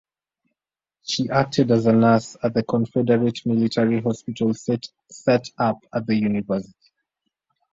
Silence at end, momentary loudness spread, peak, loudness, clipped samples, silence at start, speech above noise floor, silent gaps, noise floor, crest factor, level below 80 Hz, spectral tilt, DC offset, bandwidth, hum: 1.1 s; 10 LU; -4 dBFS; -21 LUFS; under 0.1%; 1.05 s; 67 dB; none; -88 dBFS; 18 dB; -58 dBFS; -6.5 dB/octave; under 0.1%; 7.8 kHz; none